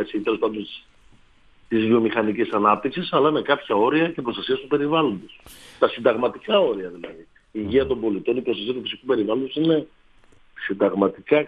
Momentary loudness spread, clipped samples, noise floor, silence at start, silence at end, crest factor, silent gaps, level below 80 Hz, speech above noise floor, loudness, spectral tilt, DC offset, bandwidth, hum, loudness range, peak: 13 LU; under 0.1%; -53 dBFS; 0 s; 0 s; 20 dB; none; -56 dBFS; 32 dB; -22 LUFS; -7 dB/octave; under 0.1%; 11.5 kHz; none; 3 LU; -2 dBFS